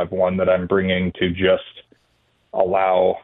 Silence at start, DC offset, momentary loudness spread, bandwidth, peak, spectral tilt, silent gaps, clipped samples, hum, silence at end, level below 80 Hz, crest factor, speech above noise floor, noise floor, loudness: 0 s; under 0.1%; 5 LU; 4 kHz; -4 dBFS; -9.5 dB/octave; none; under 0.1%; none; 0 s; -50 dBFS; 16 dB; 45 dB; -63 dBFS; -19 LUFS